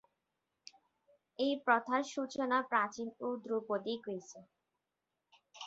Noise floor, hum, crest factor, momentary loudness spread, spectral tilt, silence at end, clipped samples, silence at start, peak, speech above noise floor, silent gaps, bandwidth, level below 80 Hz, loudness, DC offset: -88 dBFS; none; 24 dB; 13 LU; -2 dB/octave; 0 s; under 0.1%; 1.4 s; -14 dBFS; 52 dB; none; 8 kHz; -84 dBFS; -36 LUFS; under 0.1%